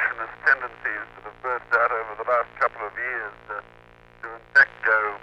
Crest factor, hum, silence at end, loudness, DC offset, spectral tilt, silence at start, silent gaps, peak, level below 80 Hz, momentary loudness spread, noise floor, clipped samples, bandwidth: 18 dB; none; 0.05 s; -23 LUFS; under 0.1%; -4 dB/octave; 0 s; none; -6 dBFS; -58 dBFS; 18 LU; -51 dBFS; under 0.1%; 8.4 kHz